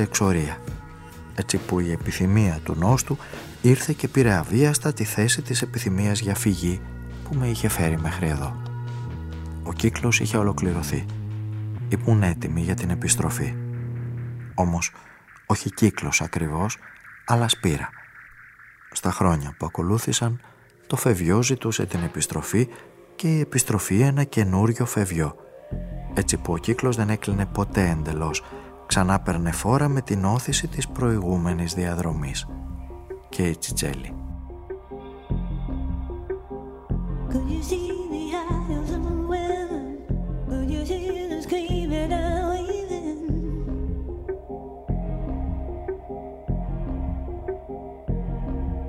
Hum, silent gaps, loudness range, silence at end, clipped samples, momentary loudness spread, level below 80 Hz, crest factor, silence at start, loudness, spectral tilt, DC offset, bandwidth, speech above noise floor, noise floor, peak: none; none; 8 LU; 0 s; under 0.1%; 14 LU; -36 dBFS; 20 dB; 0 s; -25 LUFS; -5 dB/octave; under 0.1%; 16 kHz; 25 dB; -48 dBFS; -4 dBFS